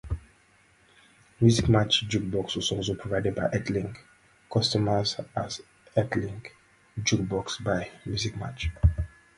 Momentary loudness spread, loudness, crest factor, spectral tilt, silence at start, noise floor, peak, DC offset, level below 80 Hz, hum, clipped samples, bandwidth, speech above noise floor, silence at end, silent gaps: 15 LU; -27 LUFS; 20 dB; -5 dB/octave; 0.05 s; -61 dBFS; -8 dBFS; under 0.1%; -40 dBFS; none; under 0.1%; 11.5 kHz; 35 dB; 0.3 s; none